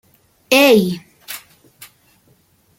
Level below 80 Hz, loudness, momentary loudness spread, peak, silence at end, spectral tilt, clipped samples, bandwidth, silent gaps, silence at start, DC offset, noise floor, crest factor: -62 dBFS; -13 LUFS; 21 LU; 0 dBFS; 1.4 s; -4 dB/octave; under 0.1%; 17 kHz; none; 0.5 s; under 0.1%; -56 dBFS; 18 dB